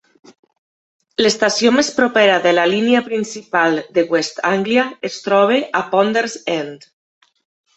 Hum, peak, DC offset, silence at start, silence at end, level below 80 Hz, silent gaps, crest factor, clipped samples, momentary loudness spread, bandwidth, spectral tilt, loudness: none; 0 dBFS; under 0.1%; 1.2 s; 1 s; -62 dBFS; none; 16 dB; under 0.1%; 9 LU; 8.2 kHz; -3.5 dB/octave; -16 LUFS